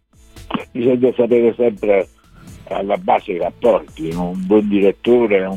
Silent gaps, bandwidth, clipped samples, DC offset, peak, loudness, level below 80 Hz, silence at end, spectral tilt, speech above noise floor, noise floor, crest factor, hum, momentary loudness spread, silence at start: none; 11.5 kHz; under 0.1%; under 0.1%; -2 dBFS; -17 LUFS; -46 dBFS; 0 s; -7.5 dB/octave; 26 dB; -41 dBFS; 16 dB; none; 11 LU; 0.35 s